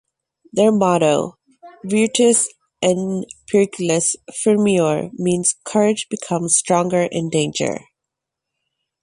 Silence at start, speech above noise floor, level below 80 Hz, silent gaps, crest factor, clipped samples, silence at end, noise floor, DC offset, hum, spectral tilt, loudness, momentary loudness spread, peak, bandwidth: 0.55 s; 65 dB; -60 dBFS; none; 16 dB; under 0.1%; 1.25 s; -82 dBFS; under 0.1%; none; -4 dB/octave; -18 LUFS; 9 LU; -2 dBFS; 11.5 kHz